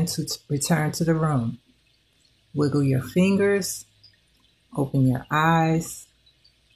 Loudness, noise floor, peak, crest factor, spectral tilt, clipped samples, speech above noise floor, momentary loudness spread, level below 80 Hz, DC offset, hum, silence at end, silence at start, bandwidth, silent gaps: -23 LUFS; -63 dBFS; -6 dBFS; 18 dB; -5.5 dB/octave; under 0.1%; 41 dB; 14 LU; -54 dBFS; under 0.1%; none; 0.7 s; 0 s; 14.5 kHz; none